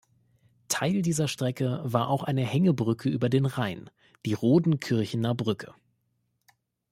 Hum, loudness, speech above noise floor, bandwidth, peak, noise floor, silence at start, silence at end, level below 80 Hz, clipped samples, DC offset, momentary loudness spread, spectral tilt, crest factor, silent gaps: none; -27 LUFS; 49 dB; 16 kHz; -8 dBFS; -75 dBFS; 0.7 s; 1.2 s; -64 dBFS; under 0.1%; under 0.1%; 9 LU; -6 dB/octave; 18 dB; none